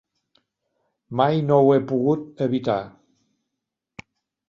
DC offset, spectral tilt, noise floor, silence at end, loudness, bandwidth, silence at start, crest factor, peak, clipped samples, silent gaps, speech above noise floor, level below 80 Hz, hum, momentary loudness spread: under 0.1%; -9 dB/octave; -83 dBFS; 1.6 s; -21 LUFS; 7 kHz; 1.1 s; 20 dB; -4 dBFS; under 0.1%; none; 63 dB; -64 dBFS; none; 11 LU